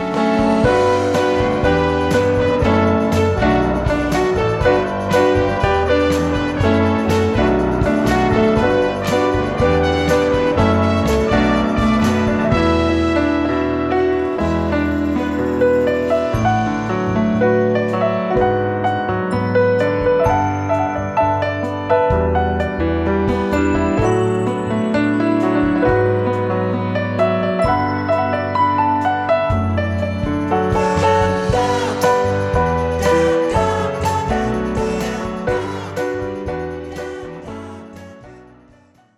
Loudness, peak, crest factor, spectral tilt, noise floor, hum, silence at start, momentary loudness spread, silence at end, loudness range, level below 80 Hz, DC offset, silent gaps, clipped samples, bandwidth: -17 LUFS; -2 dBFS; 14 dB; -6.5 dB/octave; -50 dBFS; none; 0 s; 5 LU; 0.75 s; 2 LU; -32 dBFS; under 0.1%; none; under 0.1%; 13.5 kHz